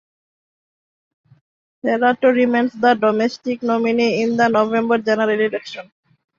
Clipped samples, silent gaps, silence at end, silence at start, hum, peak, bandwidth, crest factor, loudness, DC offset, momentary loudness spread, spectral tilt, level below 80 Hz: under 0.1%; none; 0.55 s; 1.85 s; none; -2 dBFS; 7.2 kHz; 16 dB; -17 LUFS; under 0.1%; 8 LU; -5.5 dB/octave; -66 dBFS